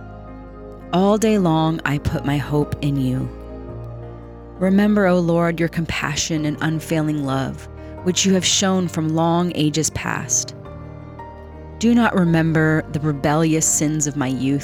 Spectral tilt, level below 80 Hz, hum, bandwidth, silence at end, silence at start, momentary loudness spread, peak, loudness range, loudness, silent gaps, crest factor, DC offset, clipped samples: -4.5 dB/octave; -42 dBFS; none; 17 kHz; 0 s; 0 s; 20 LU; -4 dBFS; 3 LU; -19 LUFS; none; 16 dB; under 0.1%; under 0.1%